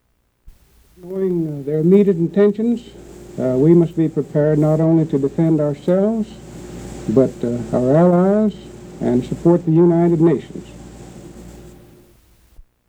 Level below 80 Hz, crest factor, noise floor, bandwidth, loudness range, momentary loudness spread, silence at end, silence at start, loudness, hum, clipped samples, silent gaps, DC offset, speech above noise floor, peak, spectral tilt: -46 dBFS; 16 dB; -51 dBFS; 9.2 kHz; 3 LU; 21 LU; 0.25 s; 0.45 s; -16 LUFS; none; under 0.1%; none; under 0.1%; 36 dB; 0 dBFS; -9.5 dB/octave